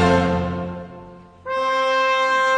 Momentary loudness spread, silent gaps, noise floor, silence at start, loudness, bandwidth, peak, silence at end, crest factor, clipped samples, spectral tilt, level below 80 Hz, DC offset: 20 LU; none; -41 dBFS; 0 s; -20 LUFS; 10 kHz; -4 dBFS; 0 s; 16 dB; under 0.1%; -5.5 dB/octave; -44 dBFS; under 0.1%